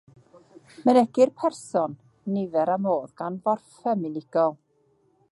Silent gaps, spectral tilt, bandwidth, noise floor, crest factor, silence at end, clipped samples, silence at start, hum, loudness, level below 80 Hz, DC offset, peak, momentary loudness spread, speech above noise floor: none; -7 dB/octave; 11.5 kHz; -65 dBFS; 20 dB; 0.75 s; under 0.1%; 0.8 s; none; -25 LUFS; -76 dBFS; under 0.1%; -6 dBFS; 10 LU; 41 dB